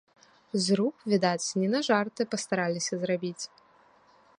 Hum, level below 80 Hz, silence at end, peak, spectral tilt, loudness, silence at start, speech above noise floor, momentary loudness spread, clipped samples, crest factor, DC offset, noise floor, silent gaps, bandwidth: none; -76 dBFS; 0.9 s; -10 dBFS; -4.5 dB/octave; -28 LUFS; 0.55 s; 33 dB; 8 LU; under 0.1%; 20 dB; under 0.1%; -61 dBFS; none; 11 kHz